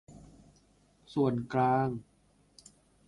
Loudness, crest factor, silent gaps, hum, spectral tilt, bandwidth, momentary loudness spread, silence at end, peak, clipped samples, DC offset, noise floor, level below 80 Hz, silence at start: -31 LUFS; 18 dB; none; 50 Hz at -60 dBFS; -8 dB/octave; 11.5 kHz; 10 LU; 1.05 s; -16 dBFS; under 0.1%; under 0.1%; -67 dBFS; -64 dBFS; 0.1 s